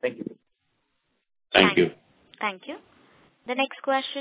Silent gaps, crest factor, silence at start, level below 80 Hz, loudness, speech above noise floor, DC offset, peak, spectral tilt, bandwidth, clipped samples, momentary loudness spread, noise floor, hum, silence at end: none; 28 dB; 0.05 s; -62 dBFS; -24 LUFS; 46 dB; under 0.1%; 0 dBFS; -8.5 dB/octave; 4 kHz; under 0.1%; 22 LU; -75 dBFS; none; 0 s